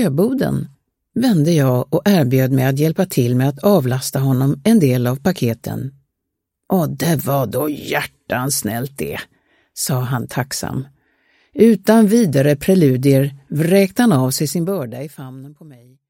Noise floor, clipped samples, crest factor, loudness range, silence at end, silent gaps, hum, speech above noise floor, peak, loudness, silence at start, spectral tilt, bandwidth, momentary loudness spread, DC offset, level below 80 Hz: -78 dBFS; under 0.1%; 16 dB; 7 LU; 0.4 s; none; none; 62 dB; 0 dBFS; -17 LUFS; 0 s; -6 dB/octave; 17 kHz; 14 LU; under 0.1%; -52 dBFS